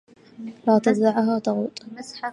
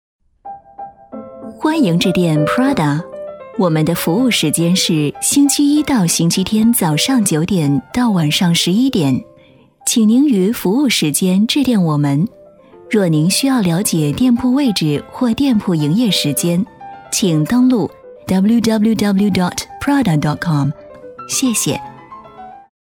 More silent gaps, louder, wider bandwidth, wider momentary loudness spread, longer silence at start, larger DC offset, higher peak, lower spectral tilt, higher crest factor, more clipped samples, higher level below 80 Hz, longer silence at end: neither; second, -22 LUFS vs -14 LUFS; second, 11 kHz vs 17.5 kHz; first, 18 LU vs 12 LU; about the same, 0.4 s vs 0.45 s; neither; second, -6 dBFS vs 0 dBFS; first, -6.5 dB/octave vs -4.5 dB/octave; about the same, 18 dB vs 14 dB; neither; second, -74 dBFS vs -48 dBFS; second, 0 s vs 0.25 s